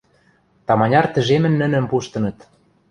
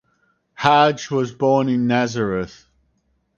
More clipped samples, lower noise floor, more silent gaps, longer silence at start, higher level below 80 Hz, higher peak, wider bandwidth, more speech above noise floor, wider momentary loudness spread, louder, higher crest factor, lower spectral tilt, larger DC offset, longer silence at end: neither; second, -58 dBFS vs -66 dBFS; neither; about the same, 0.7 s vs 0.6 s; about the same, -52 dBFS vs -54 dBFS; about the same, 0 dBFS vs 0 dBFS; first, 10.5 kHz vs 7.4 kHz; second, 41 dB vs 48 dB; about the same, 10 LU vs 9 LU; about the same, -18 LUFS vs -19 LUFS; about the same, 18 dB vs 20 dB; first, -7 dB/octave vs -5.5 dB/octave; neither; second, 0.6 s vs 0.9 s